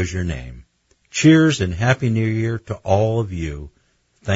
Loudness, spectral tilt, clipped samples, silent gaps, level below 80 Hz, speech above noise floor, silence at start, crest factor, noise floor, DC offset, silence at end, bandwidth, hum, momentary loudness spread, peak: -19 LUFS; -6 dB/octave; under 0.1%; none; -42 dBFS; 42 dB; 0 s; 18 dB; -60 dBFS; under 0.1%; 0 s; 8 kHz; none; 18 LU; -2 dBFS